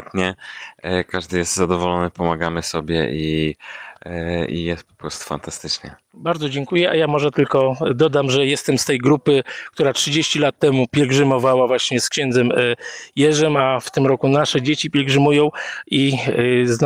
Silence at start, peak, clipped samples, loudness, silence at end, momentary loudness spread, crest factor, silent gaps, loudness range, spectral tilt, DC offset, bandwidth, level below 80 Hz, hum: 0 s; -4 dBFS; under 0.1%; -18 LUFS; 0 s; 12 LU; 14 dB; none; 7 LU; -4.5 dB/octave; under 0.1%; 16 kHz; -48 dBFS; none